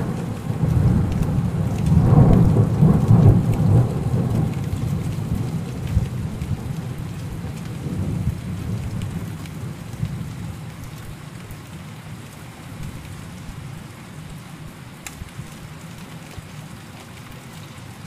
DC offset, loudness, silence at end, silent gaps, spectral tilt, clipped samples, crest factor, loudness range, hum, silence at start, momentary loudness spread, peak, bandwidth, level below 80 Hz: under 0.1%; -21 LUFS; 0 s; none; -8 dB/octave; under 0.1%; 18 dB; 20 LU; none; 0 s; 22 LU; -4 dBFS; 15 kHz; -34 dBFS